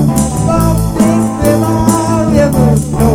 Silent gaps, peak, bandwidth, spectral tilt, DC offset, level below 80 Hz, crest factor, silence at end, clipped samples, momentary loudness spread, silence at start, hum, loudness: none; 0 dBFS; 17 kHz; -6.5 dB/octave; under 0.1%; -22 dBFS; 10 dB; 0 s; under 0.1%; 2 LU; 0 s; none; -11 LUFS